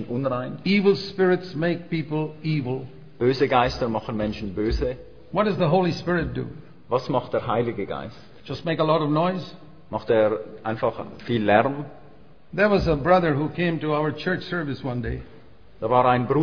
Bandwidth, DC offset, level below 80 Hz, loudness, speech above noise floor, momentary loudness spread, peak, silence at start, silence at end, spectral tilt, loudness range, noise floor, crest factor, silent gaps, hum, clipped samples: 5.4 kHz; 0.5%; -42 dBFS; -24 LUFS; 28 dB; 13 LU; -2 dBFS; 0 s; 0 s; -8 dB/octave; 3 LU; -51 dBFS; 22 dB; none; none; under 0.1%